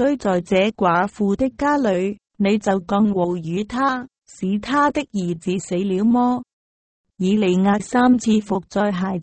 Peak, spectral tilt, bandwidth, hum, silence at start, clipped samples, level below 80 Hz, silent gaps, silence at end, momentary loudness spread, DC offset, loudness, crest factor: -6 dBFS; -6.5 dB/octave; 8.8 kHz; none; 0 s; under 0.1%; -50 dBFS; 6.53-7.04 s; 0 s; 8 LU; under 0.1%; -20 LUFS; 14 dB